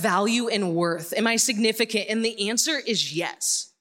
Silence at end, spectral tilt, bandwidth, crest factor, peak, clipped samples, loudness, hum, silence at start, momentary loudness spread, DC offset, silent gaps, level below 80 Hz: 0.15 s; -2.5 dB/octave; 17 kHz; 18 dB; -6 dBFS; under 0.1%; -23 LUFS; none; 0 s; 5 LU; under 0.1%; none; -78 dBFS